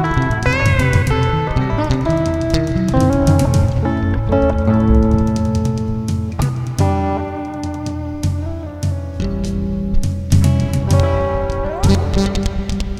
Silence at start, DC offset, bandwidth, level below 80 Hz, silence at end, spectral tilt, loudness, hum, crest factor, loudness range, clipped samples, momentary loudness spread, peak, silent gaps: 0 s; under 0.1%; 13.5 kHz; -24 dBFS; 0 s; -7 dB/octave; -17 LUFS; none; 16 dB; 6 LU; under 0.1%; 9 LU; 0 dBFS; none